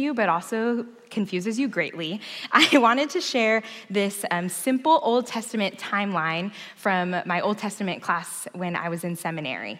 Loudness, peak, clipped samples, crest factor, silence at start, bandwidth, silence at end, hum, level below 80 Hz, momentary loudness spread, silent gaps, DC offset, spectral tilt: -24 LUFS; -4 dBFS; under 0.1%; 22 dB; 0 s; 16 kHz; 0 s; none; -78 dBFS; 10 LU; none; under 0.1%; -4 dB/octave